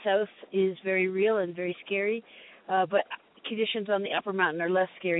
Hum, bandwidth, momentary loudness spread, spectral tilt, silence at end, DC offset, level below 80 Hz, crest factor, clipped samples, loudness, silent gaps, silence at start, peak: none; 4.1 kHz; 9 LU; -9 dB/octave; 0 s; under 0.1%; -80 dBFS; 16 dB; under 0.1%; -28 LUFS; none; 0 s; -12 dBFS